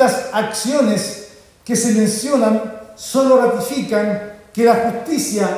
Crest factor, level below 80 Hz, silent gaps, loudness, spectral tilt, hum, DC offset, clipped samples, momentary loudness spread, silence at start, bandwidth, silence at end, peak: 16 dB; -56 dBFS; none; -17 LUFS; -4.5 dB/octave; none; under 0.1%; under 0.1%; 13 LU; 0 s; 16 kHz; 0 s; -2 dBFS